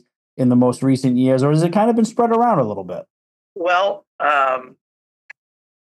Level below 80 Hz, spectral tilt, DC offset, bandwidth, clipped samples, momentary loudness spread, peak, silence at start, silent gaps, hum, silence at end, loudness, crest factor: -70 dBFS; -7 dB/octave; under 0.1%; 12 kHz; under 0.1%; 9 LU; -2 dBFS; 0.35 s; 3.10-3.55 s, 4.07-4.19 s; none; 1.2 s; -17 LUFS; 16 dB